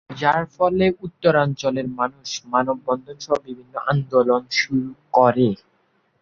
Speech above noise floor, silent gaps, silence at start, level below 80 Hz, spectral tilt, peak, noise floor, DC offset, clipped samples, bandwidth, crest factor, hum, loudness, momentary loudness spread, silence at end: 44 dB; none; 0.1 s; -56 dBFS; -5.5 dB/octave; -2 dBFS; -64 dBFS; under 0.1%; under 0.1%; 7.4 kHz; 20 dB; none; -21 LUFS; 9 LU; 0.65 s